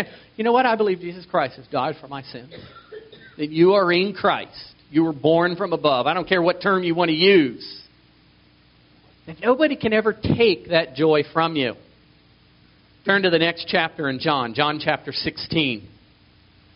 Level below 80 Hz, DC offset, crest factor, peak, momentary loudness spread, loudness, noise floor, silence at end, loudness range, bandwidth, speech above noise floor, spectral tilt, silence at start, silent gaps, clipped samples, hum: -56 dBFS; under 0.1%; 20 dB; -2 dBFS; 17 LU; -20 LUFS; -55 dBFS; 0.9 s; 4 LU; 5.6 kHz; 34 dB; -3 dB/octave; 0 s; none; under 0.1%; none